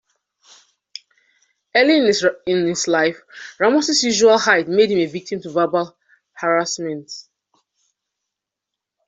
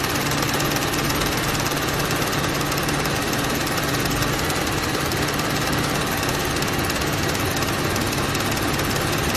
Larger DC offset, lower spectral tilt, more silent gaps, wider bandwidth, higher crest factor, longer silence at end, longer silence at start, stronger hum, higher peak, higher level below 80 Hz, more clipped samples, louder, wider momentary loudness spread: neither; about the same, -3 dB/octave vs -3.5 dB/octave; neither; second, 8.2 kHz vs 14.5 kHz; about the same, 18 dB vs 18 dB; first, 1.85 s vs 0 s; first, 1.75 s vs 0 s; neither; about the same, -2 dBFS vs -4 dBFS; second, -64 dBFS vs -36 dBFS; neither; first, -17 LUFS vs -21 LUFS; first, 22 LU vs 1 LU